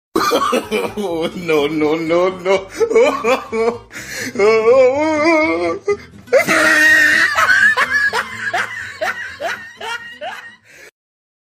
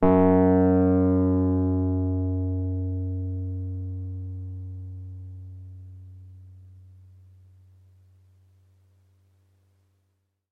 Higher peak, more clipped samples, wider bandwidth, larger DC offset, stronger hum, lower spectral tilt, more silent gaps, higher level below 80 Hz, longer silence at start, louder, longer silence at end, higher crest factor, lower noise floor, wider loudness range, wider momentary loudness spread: first, -2 dBFS vs -6 dBFS; neither; first, 15.5 kHz vs 2.9 kHz; neither; second, none vs 50 Hz at -75 dBFS; second, -3 dB/octave vs -13 dB/octave; neither; about the same, -52 dBFS vs -56 dBFS; first, 0.15 s vs 0 s; first, -14 LUFS vs -24 LUFS; second, 0.6 s vs 3.8 s; second, 14 dB vs 20 dB; second, -40 dBFS vs -74 dBFS; second, 6 LU vs 23 LU; second, 15 LU vs 24 LU